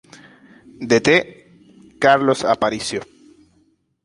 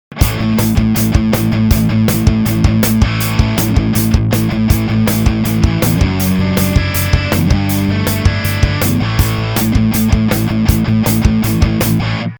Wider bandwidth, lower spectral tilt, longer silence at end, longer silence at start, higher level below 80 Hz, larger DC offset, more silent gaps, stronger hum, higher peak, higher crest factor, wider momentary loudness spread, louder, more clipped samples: second, 11.5 kHz vs over 20 kHz; second, -4 dB/octave vs -6 dB/octave; first, 1 s vs 0 s; first, 0.8 s vs 0.1 s; second, -56 dBFS vs -20 dBFS; neither; neither; neither; about the same, 0 dBFS vs 0 dBFS; first, 20 dB vs 12 dB; first, 15 LU vs 2 LU; second, -17 LUFS vs -13 LUFS; second, under 0.1% vs 0.2%